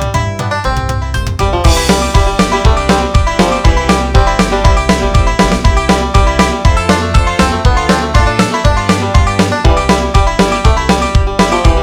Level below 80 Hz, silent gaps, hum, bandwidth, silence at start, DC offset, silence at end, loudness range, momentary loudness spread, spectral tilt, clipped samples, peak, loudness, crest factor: -14 dBFS; none; none; 15 kHz; 0 s; 0.3%; 0 s; 1 LU; 4 LU; -5 dB/octave; 1%; 0 dBFS; -11 LUFS; 10 dB